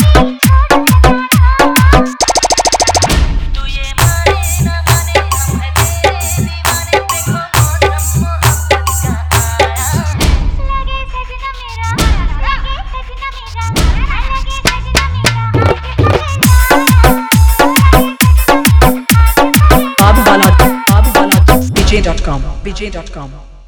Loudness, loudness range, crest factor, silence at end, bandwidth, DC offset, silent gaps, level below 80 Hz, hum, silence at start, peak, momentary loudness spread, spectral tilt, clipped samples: -10 LUFS; 8 LU; 10 dB; 0.1 s; over 20 kHz; under 0.1%; none; -14 dBFS; none; 0 s; 0 dBFS; 13 LU; -4.5 dB/octave; 0.7%